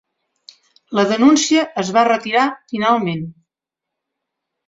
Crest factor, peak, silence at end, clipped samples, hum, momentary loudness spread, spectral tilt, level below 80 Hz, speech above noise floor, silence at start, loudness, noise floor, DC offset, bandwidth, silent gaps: 16 dB; -2 dBFS; 1.35 s; under 0.1%; none; 11 LU; -4 dB/octave; -62 dBFS; 68 dB; 0.9 s; -16 LUFS; -84 dBFS; under 0.1%; 7.8 kHz; none